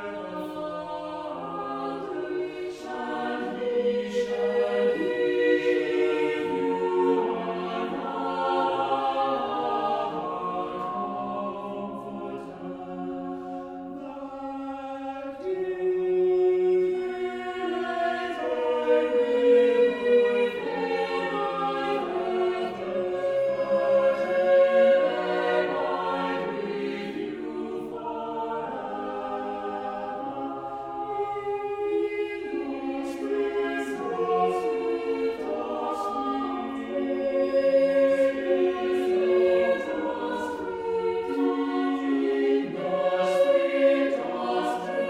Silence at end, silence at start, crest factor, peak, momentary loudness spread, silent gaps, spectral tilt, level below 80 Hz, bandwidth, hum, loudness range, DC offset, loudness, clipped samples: 0 s; 0 s; 16 dB; -10 dBFS; 12 LU; none; -6 dB/octave; -64 dBFS; 11 kHz; none; 9 LU; under 0.1%; -27 LUFS; under 0.1%